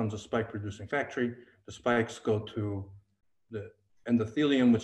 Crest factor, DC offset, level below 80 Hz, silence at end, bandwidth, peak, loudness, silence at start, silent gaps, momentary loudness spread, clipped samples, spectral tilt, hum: 18 dB; under 0.1%; -66 dBFS; 0 s; 9 kHz; -14 dBFS; -31 LUFS; 0 s; none; 17 LU; under 0.1%; -6.5 dB/octave; none